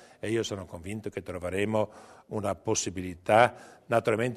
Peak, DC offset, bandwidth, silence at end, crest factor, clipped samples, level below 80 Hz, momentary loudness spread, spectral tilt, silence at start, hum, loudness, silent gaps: -6 dBFS; under 0.1%; 13.5 kHz; 0 s; 24 dB; under 0.1%; -60 dBFS; 15 LU; -4.5 dB/octave; 0.25 s; none; -29 LUFS; none